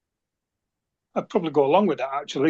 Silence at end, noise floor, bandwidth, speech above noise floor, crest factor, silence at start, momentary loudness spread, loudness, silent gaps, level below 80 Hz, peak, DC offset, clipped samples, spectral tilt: 0 s; -84 dBFS; 7.8 kHz; 62 dB; 20 dB; 1.15 s; 11 LU; -23 LUFS; none; -74 dBFS; -6 dBFS; under 0.1%; under 0.1%; -6.5 dB/octave